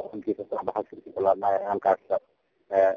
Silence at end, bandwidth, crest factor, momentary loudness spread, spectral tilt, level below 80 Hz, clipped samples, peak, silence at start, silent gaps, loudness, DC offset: 0 s; 6.8 kHz; 18 dB; 8 LU; -7.5 dB/octave; -66 dBFS; under 0.1%; -8 dBFS; 0 s; none; -27 LUFS; under 0.1%